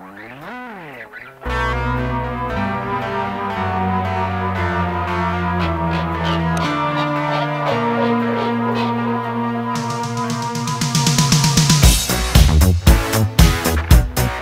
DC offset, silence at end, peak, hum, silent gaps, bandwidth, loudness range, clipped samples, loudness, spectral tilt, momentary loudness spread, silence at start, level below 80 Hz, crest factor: under 0.1%; 0 s; 0 dBFS; none; none; 16 kHz; 7 LU; under 0.1%; -18 LUFS; -4.5 dB/octave; 9 LU; 0 s; -22 dBFS; 18 dB